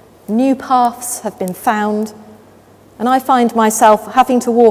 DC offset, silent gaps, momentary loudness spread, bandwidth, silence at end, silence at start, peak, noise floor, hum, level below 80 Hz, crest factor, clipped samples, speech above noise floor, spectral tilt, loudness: under 0.1%; none; 11 LU; 16 kHz; 0 s; 0.3 s; 0 dBFS; -44 dBFS; none; -56 dBFS; 14 dB; 0.2%; 31 dB; -4.5 dB/octave; -14 LUFS